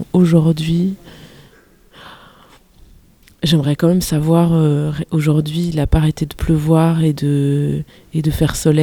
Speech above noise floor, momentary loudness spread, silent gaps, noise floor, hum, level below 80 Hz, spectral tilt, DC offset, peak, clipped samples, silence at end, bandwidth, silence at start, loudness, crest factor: 33 dB; 8 LU; none; -48 dBFS; none; -30 dBFS; -7 dB/octave; under 0.1%; 0 dBFS; under 0.1%; 0 s; 17.5 kHz; 0 s; -16 LUFS; 16 dB